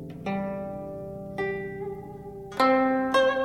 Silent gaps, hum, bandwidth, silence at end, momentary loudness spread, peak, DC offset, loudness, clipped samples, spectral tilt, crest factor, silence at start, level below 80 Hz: none; none; 13 kHz; 0 s; 15 LU; -8 dBFS; under 0.1%; -27 LUFS; under 0.1%; -6 dB/octave; 18 dB; 0 s; -56 dBFS